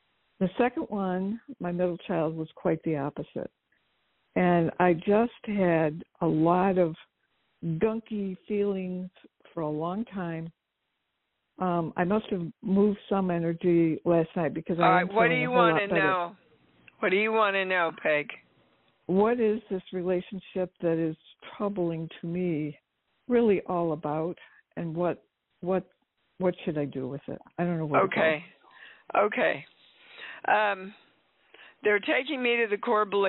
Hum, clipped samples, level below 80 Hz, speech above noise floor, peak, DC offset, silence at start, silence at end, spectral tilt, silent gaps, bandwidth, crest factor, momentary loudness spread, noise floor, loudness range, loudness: none; under 0.1%; -64 dBFS; 54 dB; -8 dBFS; under 0.1%; 0.4 s; 0 s; -5 dB/octave; none; 4.2 kHz; 20 dB; 13 LU; -81 dBFS; 7 LU; -28 LUFS